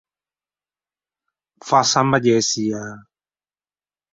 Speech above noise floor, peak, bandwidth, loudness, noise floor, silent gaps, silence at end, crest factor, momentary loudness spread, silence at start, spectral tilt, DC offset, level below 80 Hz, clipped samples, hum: over 72 dB; -2 dBFS; 7.8 kHz; -17 LUFS; under -90 dBFS; none; 1.1 s; 20 dB; 17 LU; 1.65 s; -3.5 dB/octave; under 0.1%; -62 dBFS; under 0.1%; 50 Hz at -60 dBFS